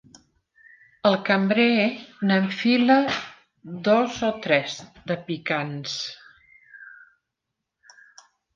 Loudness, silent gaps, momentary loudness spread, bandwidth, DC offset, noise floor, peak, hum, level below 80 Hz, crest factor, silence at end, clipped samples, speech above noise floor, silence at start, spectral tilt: -23 LUFS; none; 15 LU; 7.4 kHz; under 0.1%; -83 dBFS; -4 dBFS; none; -66 dBFS; 20 dB; 1.65 s; under 0.1%; 60 dB; 1.05 s; -5.5 dB/octave